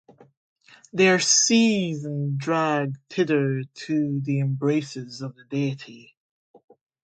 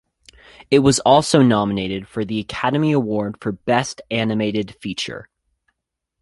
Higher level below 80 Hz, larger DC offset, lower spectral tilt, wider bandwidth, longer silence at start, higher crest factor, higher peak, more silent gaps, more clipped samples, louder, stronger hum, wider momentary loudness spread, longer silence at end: second, -70 dBFS vs -50 dBFS; neither; about the same, -4 dB/octave vs -5 dB/octave; second, 10 kHz vs 11.5 kHz; first, 0.95 s vs 0.7 s; about the same, 18 dB vs 18 dB; second, -6 dBFS vs 0 dBFS; neither; neither; second, -23 LUFS vs -19 LUFS; neither; first, 17 LU vs 12 LU; about the same, 1 s vs 1 s